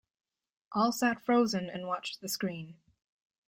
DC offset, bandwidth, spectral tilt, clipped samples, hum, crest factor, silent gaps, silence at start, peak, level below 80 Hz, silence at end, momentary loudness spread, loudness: under 0.1%; 16 kHz; -4.5 dB/octave; under 0.1%; none; 18 dB; none; 0.7 s; -16 dBFS; -74 dBFS; 0.75 s; 10 LU; -31 LUFS